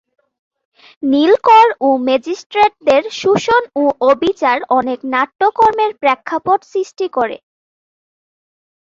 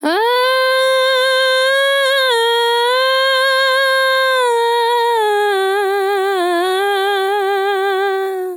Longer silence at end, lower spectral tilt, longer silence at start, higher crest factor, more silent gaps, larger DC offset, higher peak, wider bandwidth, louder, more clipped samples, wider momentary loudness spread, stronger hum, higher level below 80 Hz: first, 1.6 s vs 0 s; first, -4.5 dB/octave vs 1 dB/octave; first, 1 s vs 0 s; about the same, 14 dB vs 10 dB; first, 2.46-2.50 s vs none; neither; about the same, -2 dBFS vs -4 dBFS; second, 7.6 kHz vs 18.5 kHz; about the same, -14 LUFS vs -14 LUFS; neither; first, 10 LU vs 4 LU; neither; first, -56 dBFS vs under -90 dBFS